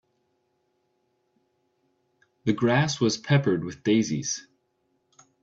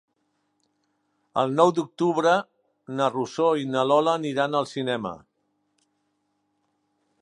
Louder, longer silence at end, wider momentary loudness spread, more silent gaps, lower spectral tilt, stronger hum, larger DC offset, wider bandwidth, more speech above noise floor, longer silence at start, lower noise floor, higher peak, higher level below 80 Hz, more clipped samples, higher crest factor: about the same, -25 LUFS vs -24 LUFS; second, 1 s vs 2.05 s; about the same, 8 LU vs 10 LU; neither; about the same, -5 dB/octave vs -5.5 dB/octave; second, none vs 50 Hz at -65 dBFS; neither; second, 8 kHz vs 11 kHz; about the same, 49 dB vs 50 dB; first, 2.45 s vs 1.35 s; about the same, -73 dBFS vs -74 dBFS; second, -8 dBFS vs -4 dBFS; first, -64 dBFS vs -72 dBFS; neither; about the same, 20 dB vs 22 dB